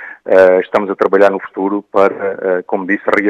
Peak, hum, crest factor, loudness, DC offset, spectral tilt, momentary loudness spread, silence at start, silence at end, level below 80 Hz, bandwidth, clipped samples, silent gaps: 0 dBFS; none; 12 dB; -13 LUFS; under 0.1%; -7 dB/octave; 9 LU; 0 s; 0 s; -58 dBFS; 8.2 kHz; 0.3%; none